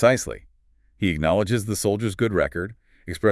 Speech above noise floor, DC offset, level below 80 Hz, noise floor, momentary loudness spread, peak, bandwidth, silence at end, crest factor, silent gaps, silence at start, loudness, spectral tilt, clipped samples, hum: 38 dB; under 0.1%; -46 dBFS; -60 dBFS; 14 LU; -4 dBFS; 12 kHz; 0 s; 20 dB; none; 0 s; -23 LUFS; -5.5 dB/octave; under 0.1%; none